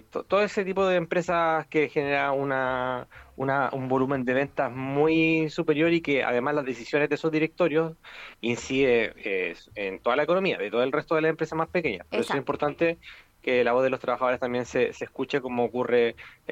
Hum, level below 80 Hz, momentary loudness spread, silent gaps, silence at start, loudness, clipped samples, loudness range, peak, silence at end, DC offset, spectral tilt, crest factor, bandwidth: none; -58 dBFS; 7 LU; none; 0.15 s; -26 LUFS; under 0.1%; 2 LU; -10 dBFS; 0 s; under 0.1%; -6 dB/octave; 16 dB; 10.5 kHz